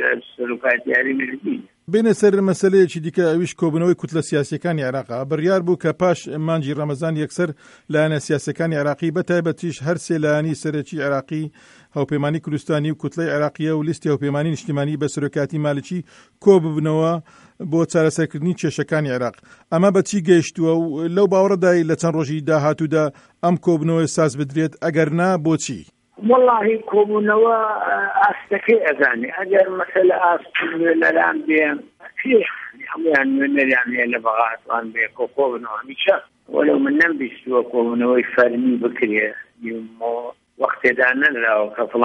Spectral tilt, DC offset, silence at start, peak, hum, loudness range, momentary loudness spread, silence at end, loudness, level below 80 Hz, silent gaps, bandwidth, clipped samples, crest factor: -6 dB/octave; under 0.1%; 0 s; -2 dBFS; none; 5 LU; 9 LU; 0 s; -19 LUFS; -64 dBFS; none; 11.5 kHz; under 0.1%; 18 dB